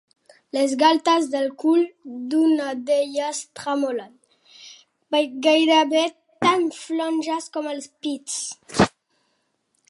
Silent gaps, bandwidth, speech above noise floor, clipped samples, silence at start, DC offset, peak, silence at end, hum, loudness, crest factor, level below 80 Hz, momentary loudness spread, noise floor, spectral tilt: none; 11.5 kHz; 49 dB; under 0.1%; 0.55 s; under 0.1%; -2 dBFS; 1 s; none; -22 LUFS; 20 dB; -58 dBFS; 12 LU; -71 dBFS; -4 dB/octave